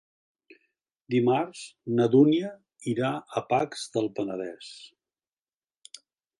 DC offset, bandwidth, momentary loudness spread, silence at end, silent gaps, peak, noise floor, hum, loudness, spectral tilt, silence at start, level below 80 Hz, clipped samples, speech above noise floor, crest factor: under 0.1%; 11.5 kHz; 23 LU; 1.5 s; none; -8 dBFS; under -90 dBFS; none; -27 LUFS; -6.5 dB/octave; 1.1 s; -74 dBFS; under 0.1%; over 64 dB; 20 dB